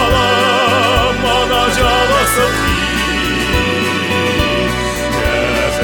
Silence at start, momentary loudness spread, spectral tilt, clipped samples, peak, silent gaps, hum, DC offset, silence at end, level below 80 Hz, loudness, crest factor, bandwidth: 0 s; 4 LU; -3.5 dB/octave; under 0.1%; -2 dBFS; none; none; under 0.1%; 0 s; -26 dBFS; -13 LUFS; 12 dB; 19.5 kHz